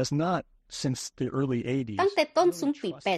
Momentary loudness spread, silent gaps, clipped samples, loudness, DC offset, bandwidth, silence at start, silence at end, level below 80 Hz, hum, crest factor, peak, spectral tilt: 8 LU; none; under 0.1%; -28 LUFS; under 0.1%; 13 kHz; 0 s; 0 s; -62 dBFS; none; 18 dB; -10 dBFS; -5.5 dB/octave